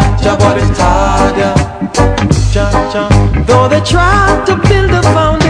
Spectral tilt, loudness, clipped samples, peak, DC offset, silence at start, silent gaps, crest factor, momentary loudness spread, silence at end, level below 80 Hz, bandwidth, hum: -6 dB/octave; -10 LUFS; 2%; 0 dBFS; under 0.1%; 0 s; none; 8 dB; 4 LU; 0 s; -16 dBFS; 10.5 kHz; none